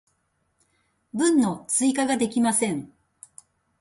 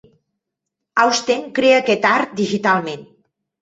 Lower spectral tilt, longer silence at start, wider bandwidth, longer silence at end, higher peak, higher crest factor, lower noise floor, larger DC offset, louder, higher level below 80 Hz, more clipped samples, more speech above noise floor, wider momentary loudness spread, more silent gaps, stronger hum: about the same, -3.5 dB/octave vs -3.5 dB/octave; first, 1.15 s vs 0.95 s; first, 11.5 kHz vs 8 kHz; first, 0.95 s vs 0.6 s; second, -10 dBFS vs -2 dBFS; about the same, 16 dB vs 18 dB; second, -72 dBFS vs -80 dBFS; neither; second, -23 LUFS vs -17 LUFS; about the same, -66 dBFS vs -64 dBFS; neither; second, 49 dB vs 64 dB; about the same, 8 LU vs 8 LU; neither; neither